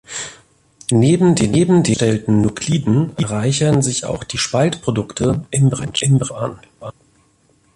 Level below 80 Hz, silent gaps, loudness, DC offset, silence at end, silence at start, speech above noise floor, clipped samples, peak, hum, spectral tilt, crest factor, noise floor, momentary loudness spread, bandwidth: -44 dBFS; none; -17 LUFS; under 0.1%; 0.85 s; 0.1 s; 41 dB; under 0.1%; -2 dBFS; none; -5.5 dB/octave; 14 dB; -57 dBFS; 14 LU; 11.5 kHz